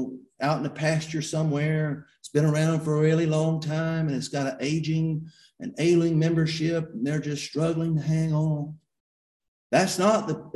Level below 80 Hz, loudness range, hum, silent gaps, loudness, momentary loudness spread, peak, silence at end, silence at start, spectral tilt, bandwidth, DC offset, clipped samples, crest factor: -60 dBFS; 2 LU; none; 9.00-9.40 s, 9.48-9.70 s; -25 LUFS; 8 LU; -8 dBFS; 0.05 s; 0 s; -6.5 dB/octave; 12 kHz; under 0.1%; under 0.1%; 18 dB